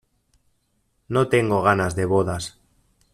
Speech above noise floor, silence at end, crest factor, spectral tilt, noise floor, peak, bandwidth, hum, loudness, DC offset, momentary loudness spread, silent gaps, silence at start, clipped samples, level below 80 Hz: 48 dB; 0.65 s; 20 dB; -6 dB/octave; -69 dBFS; -4 dBFS; 14 kHz; none; -21 LUFS; under 0.1%; 10 LU; none; 1.1 s; under 0.1%; -52 dBFS